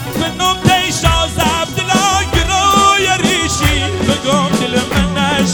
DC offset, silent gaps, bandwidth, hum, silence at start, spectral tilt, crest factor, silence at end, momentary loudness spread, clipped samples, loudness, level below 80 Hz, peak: under 0.1%; none; over 20 kHz; none; 0 s; -3.5 dB/octave; 14 dB; 0 s; 5 LU; under 0.1%; -13 LUFS; -26 dBFS; 0 dBFS